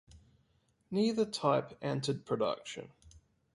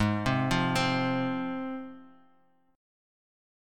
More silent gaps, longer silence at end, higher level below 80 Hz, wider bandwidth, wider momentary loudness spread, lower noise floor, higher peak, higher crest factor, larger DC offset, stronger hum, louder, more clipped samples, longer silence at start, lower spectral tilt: neither; second, 0.35 s vs 1.65 s; second, -68 dBFS vs -52 dBFS; second, 11.5 kHz vs 16.5 kHz; about the same, 13 LU vs 12 LU; first, -73 dBFS vs -67 dBFS; about the same, -14 dBFS vs -14 dBFS; about the same, 20 dB vs 18 dB; neither; neither; second, -34 LUFS vs -29 LUFS; neither; first, 0.15 s vs 0 s; about the same, -5.5 dB/octave vs -5.5 dB/octave